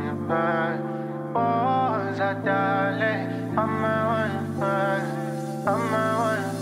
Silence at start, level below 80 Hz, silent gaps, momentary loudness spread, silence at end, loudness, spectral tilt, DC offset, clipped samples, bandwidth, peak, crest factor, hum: 0 s; -72 dBFS; none; 6 LU; 0 s; -25 LUFS; -7 dB/octave; under 0.1%; under 0.1%; 16 kHz; -10 dBFS; 16 dB; none